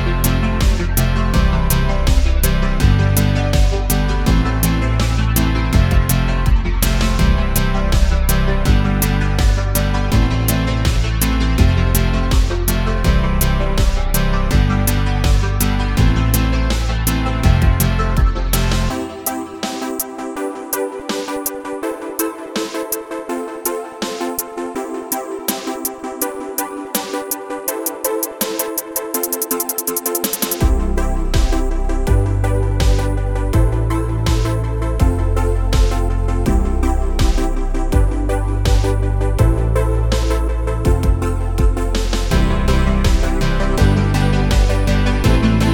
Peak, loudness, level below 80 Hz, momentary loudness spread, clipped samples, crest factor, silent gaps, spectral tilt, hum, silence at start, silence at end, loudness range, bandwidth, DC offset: 0 dBFS; -18 LUFS; -18 dBFS; 7 LU; under 0.1%; 14 dB; none; -5.5 dB/octave; none; 0 s; 0 s; 6 LU; 19.5 kHz; under 0.1%